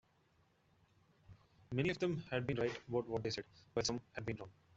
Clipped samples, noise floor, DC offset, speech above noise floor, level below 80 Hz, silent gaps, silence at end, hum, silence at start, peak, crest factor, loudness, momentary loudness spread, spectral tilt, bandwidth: under 0.1%; -74 dBFS; under 0.1%; 34 dB; -68 dBFS; none; 0.25 s; none; 1.3 s; -22 dBFS; 20 dB; -41 LUFS; 8 LU; -5 dB/octave; 8 kHz